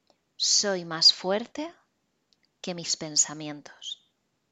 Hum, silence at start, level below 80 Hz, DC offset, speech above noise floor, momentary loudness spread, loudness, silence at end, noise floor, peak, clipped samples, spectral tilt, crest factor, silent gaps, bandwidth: none; 0.4 s; -78 dBFS; under 0.1%; 47 dB; 21 LU; -23 LUFS; 0.55 s; -74 dBFS; -6 dBFS; under 0.1%; -1 dB/octave; 24 dB; none; 15.5 kHz